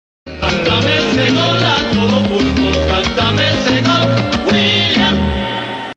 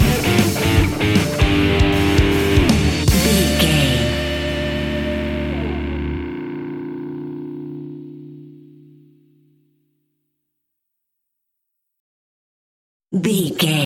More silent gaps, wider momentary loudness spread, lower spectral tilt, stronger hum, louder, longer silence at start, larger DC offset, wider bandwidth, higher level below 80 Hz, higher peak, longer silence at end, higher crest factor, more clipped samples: second, none vs 12.00-13.00 s; second, 6 LU vs 15 LU; about the same, -5 dB/octave vs -5 dB/octave; neither; first, -13 LUFS vs -18 LUFS; first, 0.25 s vs 0 s; neither; second, 8.6 kHz vs 17 kHz; about the same, -28 dBFS vs -28 dBFS; about the same, 0 dBFS vs -2 dBFS; about the same, 0.05 s vs 0 s; about the same, 14 dB vs 18 dB; neither